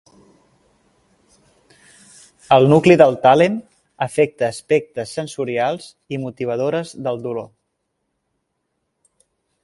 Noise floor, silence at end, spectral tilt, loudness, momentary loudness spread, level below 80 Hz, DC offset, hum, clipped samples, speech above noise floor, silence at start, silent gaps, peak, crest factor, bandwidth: -73 dBFS; 2.2 s; -6.5 dB/octave; -17 LUFS; 16 LU; -60 dBFS; under 0.1%; none; under 0.1%; 57 dB; 2.5 s; none; 0 dBFS; 20 dB; 11.5 kHz